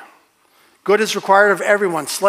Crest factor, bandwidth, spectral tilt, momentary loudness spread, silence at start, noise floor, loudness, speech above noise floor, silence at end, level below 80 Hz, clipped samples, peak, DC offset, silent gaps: 18 dB; 16 kHz; -3 dB/octave; 7 LU; 0 s; -55 dBFS; -15 LUFS; 40 dB; 0 s; -84 dBFS; under 0.1%; 0 dBFS; under 0.1%; none